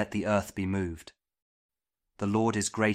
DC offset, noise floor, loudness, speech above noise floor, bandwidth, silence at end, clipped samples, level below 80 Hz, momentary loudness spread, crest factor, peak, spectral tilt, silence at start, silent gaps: under 0.1%; -62 dBFS; -30 LUFS; 33 dB; 15.5 kHz; 0 s; under 0.1%; -56 dBFS; 9 LU; 20 dB; -12 dBFS; -5 dB/octave; 0 s; 1.42-1.69 s